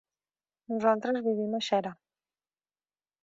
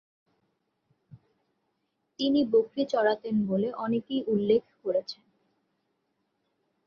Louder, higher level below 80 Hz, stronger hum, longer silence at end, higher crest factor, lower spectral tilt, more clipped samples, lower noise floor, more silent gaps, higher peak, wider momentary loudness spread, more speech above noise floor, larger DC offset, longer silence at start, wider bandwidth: about the same, -29 LUFS vs -27 LUFS; second, -80 dBFS vs -72 dBFS; first, 50 Hz at -90 dBFS vs none; second, 1.3 s vs 1.75 s; about the same, 22 dB vs 18 dB; second, -5 dB/octave vs -7 dB/octave; neither; first, under -90 dBFS vs -78 dBFS; neither; about the same, -12 dBFS vs -12 dBFS; about the same, 7 LU vs 7 LU; first, over 61 dB vs 51 dB; neither; second, 0.7 s vs 1.15 s; first, 7.8 kHz vs 7 kHz